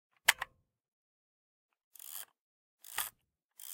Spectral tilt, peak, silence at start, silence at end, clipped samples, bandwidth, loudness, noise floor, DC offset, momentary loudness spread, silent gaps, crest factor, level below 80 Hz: 2.5 dB/octave; -6 dBFS; 0.25 s; 0 s; under 0.1%; 17 kHz; -36 LUFS; -74 dBFS; under 0.1%; 21 LU; 0.88-1.69 s, 1.84-1.91 s, 2.40-2.78 s, 3.45-3.49 s; 36 dB; -78 dBFS